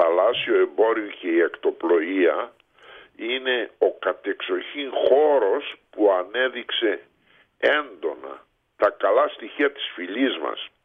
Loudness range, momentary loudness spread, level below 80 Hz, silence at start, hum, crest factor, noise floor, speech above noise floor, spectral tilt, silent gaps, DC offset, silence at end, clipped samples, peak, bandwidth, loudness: 2 LU; 11 LU; -72 dBFS; 0 s; none; 16 dB; -59 dBFS; 36 dB; -5.5 dB/octave; none; under 0.1%; 0.15 s; under 0.1%; -6 dBFS; 4.8 kHz; -23 LUFS